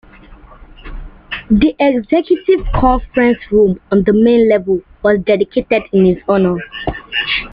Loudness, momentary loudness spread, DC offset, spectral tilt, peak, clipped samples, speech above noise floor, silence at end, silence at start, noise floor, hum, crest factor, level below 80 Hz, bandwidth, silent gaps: -13 LUFS; 9 LU; under 0.1%; -9 dB/octave; -2 dBFS; under 0.1%; 26 dB; 0 s; 0.3 s; -39 dBFS; none; 12 dB; -30 dBFS; 5.4 kHz; none